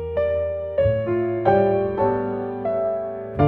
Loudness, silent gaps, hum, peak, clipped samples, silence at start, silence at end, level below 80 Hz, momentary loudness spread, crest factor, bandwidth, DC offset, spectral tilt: -22 LUFS; none; none; -4 dBFS; under 0.1%; 0 s; 0 s; -44 dBFS; 8 LU; 18 dB; 4.3 kHz; 0.1%; -10.5 dB/octave